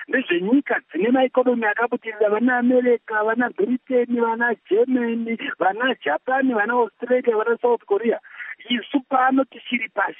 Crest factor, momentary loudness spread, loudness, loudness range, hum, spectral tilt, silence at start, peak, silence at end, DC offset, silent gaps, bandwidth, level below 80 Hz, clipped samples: 14 dB; 6 LU; -21 LUFS; 2 LU; none; -2.5 dB/octave; 0 s; -6 dBFS; 0.05 s; under 0.1%; none; 3.8 kHz; -82 dBFS; under 0.1%